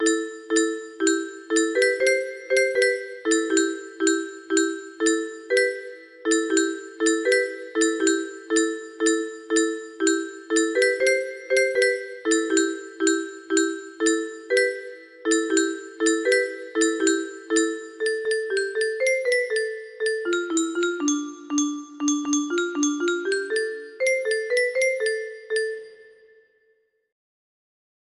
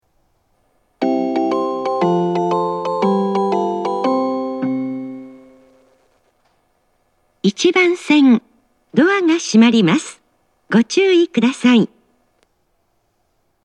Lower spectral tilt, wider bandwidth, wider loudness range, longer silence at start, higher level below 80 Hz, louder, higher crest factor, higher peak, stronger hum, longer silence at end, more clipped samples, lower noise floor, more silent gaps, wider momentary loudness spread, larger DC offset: second, -0.5 dB/octave vs -5.5 dB/octave; first, 12.5 kHz vs 10.5 kHz; second, 3 LU vs 9 LU; second, 0 s vs 1 s; about the same, -72 dBFS vs -70 dBFS; second, -23 LUFS vs -16 LUFS; about the same, 16 dB vs 16 dB; second, -8 dBFS vs 0 dBFS; neither; first, 2.05 s vs 1.8 s; neither; about the same, -67 dBFS vs -65 dBFS; neither; about the same, 7 LU vs 9 LU; neither